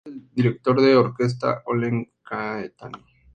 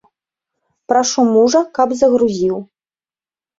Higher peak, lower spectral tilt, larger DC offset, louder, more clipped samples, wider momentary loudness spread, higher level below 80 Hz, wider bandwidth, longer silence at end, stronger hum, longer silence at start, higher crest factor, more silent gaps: about the same, -4 dBFS vs -2 dBFS; first, -8 dB/octave vs -4 dB/octave; neither; second, -22 LUFS vs -14 LUFS; neither; first, 17 LU vs 7 LU; about the same, -60 dBFS vs -58 dBFS; first, 9 kHz vs 7.8 kHz; second, 0.4 s vs 0.95 s; neither; second, 0.05 s vs 0.9 s; about the same, 18 dB vs 16 dB; neither